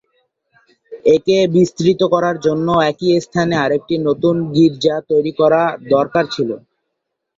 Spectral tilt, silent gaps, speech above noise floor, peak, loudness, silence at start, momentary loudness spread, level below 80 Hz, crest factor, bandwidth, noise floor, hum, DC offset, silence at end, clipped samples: -6.5 dB/octave; none; 61 dB; -2 dBFS; -15 LUFS; 0.9 s; 5 LU; -54 dBFS; 14 dB; 7.8 kHz; -76 dBFS; none; under 0.1%; 0.8 s; under 0.1%